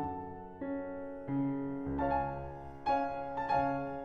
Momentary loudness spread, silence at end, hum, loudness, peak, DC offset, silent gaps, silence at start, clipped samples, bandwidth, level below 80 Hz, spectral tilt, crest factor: 11 LU; 0 s; none; -36 LUFS; -20 dBFS; under 0.1%; none; 0 s; under 0.1%; 6.4 kHz; -54 dBFS; -9 dB/octave; 16 dB